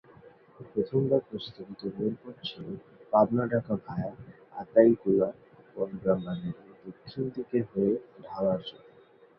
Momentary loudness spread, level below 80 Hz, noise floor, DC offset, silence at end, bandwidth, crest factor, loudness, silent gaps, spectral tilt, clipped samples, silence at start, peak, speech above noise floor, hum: 19 LU; -64 dBFS; -57 dBFS; under 0.1%; 0.6 s; 5.8 kHz; 22 dB; -29 LUFS; none; -10 dB/octave; under 0.1%; 0.6 s; -6 dBFS; 29 dB; none